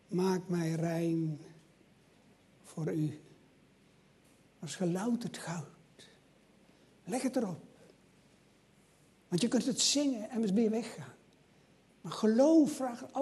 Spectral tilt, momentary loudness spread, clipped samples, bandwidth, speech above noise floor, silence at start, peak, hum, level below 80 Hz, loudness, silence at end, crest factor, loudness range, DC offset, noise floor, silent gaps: -5 dB/octave; 21 LU; under 0.1%; 12.5 kHz; 33 dB; 0.1 s; -16 dBFS; none; -78 dBFS; -33 LUFS; 0 s; 20 dB; 10 LU; under 0.1%; -65 dBFS; none